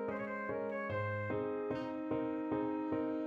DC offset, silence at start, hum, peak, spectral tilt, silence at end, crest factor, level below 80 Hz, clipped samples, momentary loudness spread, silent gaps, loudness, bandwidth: under 0.1%; 0 s; none; -24 dBFS; -9 dB/octave; 0 s; 14 dB; -70 dBFS; under 0.1%; 3 LU; none; -38 LUFS; 5.6 kHz